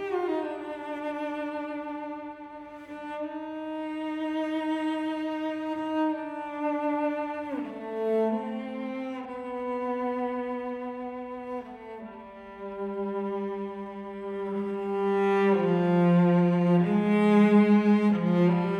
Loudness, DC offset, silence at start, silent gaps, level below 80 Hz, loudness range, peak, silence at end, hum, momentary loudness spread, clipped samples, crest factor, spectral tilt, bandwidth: -28 LUFS; under 0.1%; 0 s; none; -68 dBFS; 13 LU; -10 dBFS; 0 s; none; 17 LU; under 0.1%; 16 dB; -9 dB/octave; 8.6 kHz